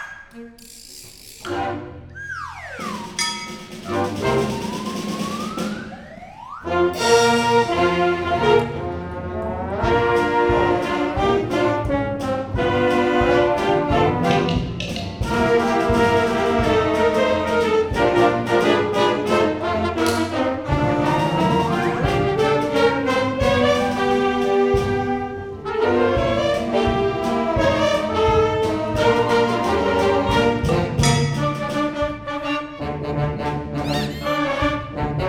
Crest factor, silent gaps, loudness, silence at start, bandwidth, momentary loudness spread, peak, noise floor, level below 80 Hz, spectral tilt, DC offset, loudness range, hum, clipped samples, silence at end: 16 dB; none; -20 LUFS; 0 s; 17.5 kHz; 12 LU; -4 dBFS; -40 dBFS; -38 dBFS; -5.5 dB/octave; under 0.1%; 6 LU; none; under 0.1%; 0 s